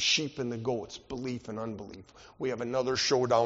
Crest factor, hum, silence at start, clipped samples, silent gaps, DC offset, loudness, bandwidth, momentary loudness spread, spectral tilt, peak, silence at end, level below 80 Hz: 18 dB; none; 0 s; under 0.1%; none; under 0.1%; -32 LUFS; 7.6 kHz; 14 LU; -2.5 dB/octave; -12 dBFS; 0 s; -62 dBFS